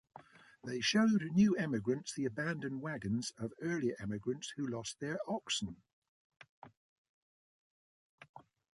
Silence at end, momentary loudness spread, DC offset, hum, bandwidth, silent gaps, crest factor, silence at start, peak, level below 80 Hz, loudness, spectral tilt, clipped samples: 0.35 s; 11 LU; under 0.1%; none; 11.5 kHz; 5.93-6.02 s, 6.08-6.30 s, 6.49-6.62 s, 6.77-8.18 s, 8.29-8.34 s; 18 dB; 0.15 s; -20 dBFS; -70 dBFS; -36 LUFS; -5 dB/octave; under 0.1%